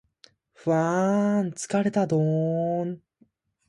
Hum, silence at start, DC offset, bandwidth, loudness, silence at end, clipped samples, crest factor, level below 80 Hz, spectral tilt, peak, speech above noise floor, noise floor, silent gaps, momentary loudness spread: none; 0.65 s; under 0.1%; 11.5 kHz; -25 LUFS; 0.7 s; under 0.1%; 14 dB; -68 dBFS; -7 dB/octave; -12 dBFS; 41 dB; -64 dBFS; none; 8 LU